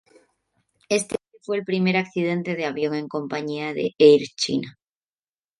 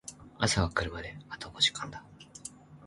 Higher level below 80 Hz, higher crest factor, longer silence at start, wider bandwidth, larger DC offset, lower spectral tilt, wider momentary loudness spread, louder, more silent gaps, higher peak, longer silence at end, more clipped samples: second, -68 dBFS vs -48 dBFS; about the same, 20 dB vs 24 dB; first, 0.9 s vs 0.05 s; about the same, 11.5 kHz vs 11.5 kHz; neither; first, -5 dB/octave vs -3 dB/octave; second, 13 LU vs 19 LU; first, -23 LUFS vs -30 LUFS; neither; first, -2 dBFS vs -10 dBFS; first, 0.9 s vs 0 s; neither